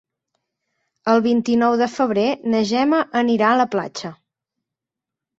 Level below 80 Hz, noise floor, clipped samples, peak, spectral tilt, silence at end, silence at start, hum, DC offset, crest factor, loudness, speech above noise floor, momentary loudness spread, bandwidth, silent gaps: -64 dBFS; -86 dBFS; under 0.1%; -4 dBFS; -5.5 dB/octave; 1.25 s; 1.05 s; none; under 0.1%; 18 dB; -18 LUFS; 68 dB; 10 LU; 7.8 kHz; none